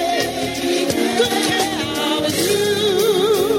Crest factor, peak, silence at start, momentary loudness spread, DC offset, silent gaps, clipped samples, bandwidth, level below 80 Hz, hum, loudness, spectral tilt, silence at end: 14 dB; -4 dBFS; 0 s; 4 LU; under 0.1%; none; under 0.1%; 16.5 kHz; -50 dBFS; none; -18 LUFS; -3 dB/octave; 0 s